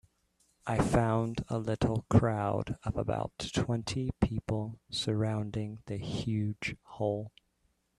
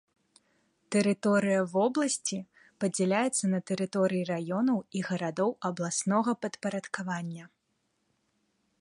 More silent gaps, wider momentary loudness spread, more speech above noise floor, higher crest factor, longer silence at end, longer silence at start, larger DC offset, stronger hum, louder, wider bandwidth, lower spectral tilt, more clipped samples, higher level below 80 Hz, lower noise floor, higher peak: neither; first, 11 LU vs 8 LU; second, 44 dB vs 48 dB; about the same, 22 dB vs 18 dB; second, 0.7 s vs 1.35 s; second, 0.65 s vs 0.9 s; neither; neither; second, -33 LUFS vs -30 LUFS; about the same, 12 kHz vs 11.5 kHz; first, -6.5 dB/octave vs -5 dB/octave; neither; first, -50 dBFS vs -76 dBFS; about the same, -75 dBFS vs -77 dBFS; about the same, -10 dBFS vs -12 dBFS